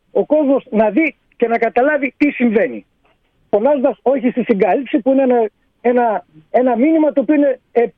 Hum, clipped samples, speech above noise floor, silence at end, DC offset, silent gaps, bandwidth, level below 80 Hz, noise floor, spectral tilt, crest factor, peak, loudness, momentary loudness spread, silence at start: none; under 0.1%; 44 dB; 0.05 s; under 0.1%; none; 5 kHz; -58 dBFS; -59 dBFS; -9.5 dB/octave; 14 dB; -2 dBFS; -15 LUFS; 6 LU; 0.15 s